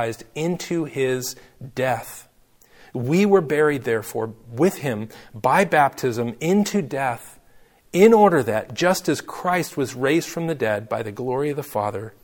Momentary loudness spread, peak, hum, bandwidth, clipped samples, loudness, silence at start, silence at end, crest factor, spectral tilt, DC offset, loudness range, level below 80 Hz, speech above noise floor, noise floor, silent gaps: 13 LU; -2 dBFS; none; 18 kHz; under 0.1%; -21 LUFS; 0 s; 0.15 s; 20 dB; -5.5 dB/octave; under 0.1%; 4 LU; -58 dBFS; 33 dB; -54 dBFS; none